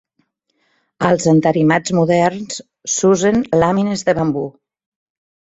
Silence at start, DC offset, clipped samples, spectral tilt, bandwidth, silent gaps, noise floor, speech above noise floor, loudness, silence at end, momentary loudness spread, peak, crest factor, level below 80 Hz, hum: 1 s; under 0.1%; under 0.1%; -5.5 dB/octave; 8.2 kHz; none; -66 dBFS; 51 dB; -15 LUFS; 1 s; 12 LU; -2 dBFS; 16 dB; -50 dBFS; none